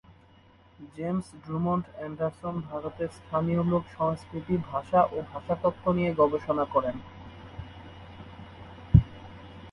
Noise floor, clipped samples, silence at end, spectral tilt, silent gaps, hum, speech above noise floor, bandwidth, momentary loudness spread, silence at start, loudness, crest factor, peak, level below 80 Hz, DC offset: -57 dBFS; under 0.1%; 0 s; -9 dB/octave; none; none; 29 dB; 11 kHz; 22 LU; 0.8 s; -28 LUFS; 26 dB; -4 dBFS; -42 dBFS; under 0.1%